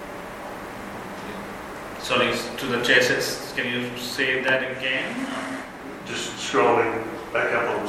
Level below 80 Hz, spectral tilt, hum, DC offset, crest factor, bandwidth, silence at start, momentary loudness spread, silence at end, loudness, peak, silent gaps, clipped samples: -54 dBFS; -3 dB/octave; none; under 0.1%; 22 dB; 16.5 kHz; 0 s; 16 LU; 0 s; -23 LUFS; -4 dBFS; none; under 0.1%